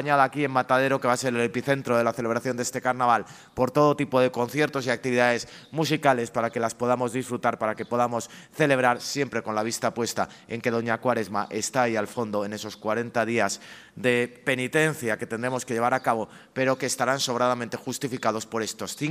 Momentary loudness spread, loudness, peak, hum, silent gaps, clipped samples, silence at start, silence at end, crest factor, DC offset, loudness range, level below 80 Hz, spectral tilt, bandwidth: 8 LU; -25 LUFS; -4 dBFS; none; none; under 0.1%; 0 s; 0 s; 20 dB; under 0.1%; 3 LU; -66 dBFS; -4.5 dB/octave; 15.5 kHz